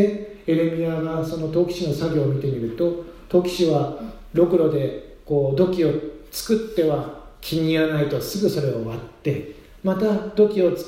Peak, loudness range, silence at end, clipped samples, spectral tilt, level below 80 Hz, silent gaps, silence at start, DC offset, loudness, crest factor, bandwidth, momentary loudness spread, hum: -4 dBFS; 2 LU; 0 s; under 0.1%; -7 dB/octave; -48 dBFS; none; 0 s; under 0.1%; -22 LUFS; 18 dB; 16 kHz; 10 LU; none